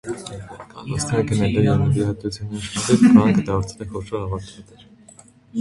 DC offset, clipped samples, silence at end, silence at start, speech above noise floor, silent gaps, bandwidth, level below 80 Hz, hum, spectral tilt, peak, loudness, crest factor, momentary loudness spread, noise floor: under 0.1%; under 0.1%; 0 s; 0.05 s; 29 dB; none; 11.5 kHz; -42 dBFS; none; -6.5 dB/octave; 0 dBFS; -19 LUFS; 20 dB; 20 LU; -48 dBFS